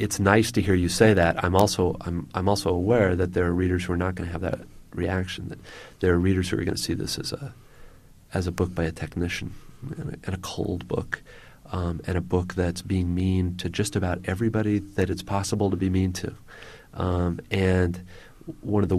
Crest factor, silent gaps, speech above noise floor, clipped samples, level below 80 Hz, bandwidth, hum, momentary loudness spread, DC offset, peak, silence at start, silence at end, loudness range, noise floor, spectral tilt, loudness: 22 dB; none; 24 dB; under 0.1%; -44 dBFS; 15 kHz; none; 15 LU; under 0.1%; -4 dBFS; 0 s; 0 s; 8 LU; -48 dBFS; -6 dB/octave; -25 LUFS